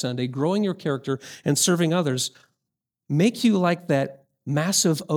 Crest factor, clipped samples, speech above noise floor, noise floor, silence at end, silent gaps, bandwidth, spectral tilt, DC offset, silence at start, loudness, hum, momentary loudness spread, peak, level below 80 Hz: 16 dB; under 0.1%; 62 dB; -84 dBFS; 0 s; none; 19.5 kHz; -4.5 dB/octave; under 0.1%; 0 s; -23 LUFS; none; 8 LU; -8 dBFS; -68 dBFS